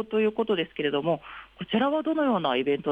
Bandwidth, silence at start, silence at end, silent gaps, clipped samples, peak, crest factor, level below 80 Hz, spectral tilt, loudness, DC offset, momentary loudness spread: 4.9 kHz; 0 s; 0 s; none; under 0.1%; -12 dBFS; 14 dB; -64 dBFS; -8 dB/octave; -26 LUFS; under 0.1%; 6 LU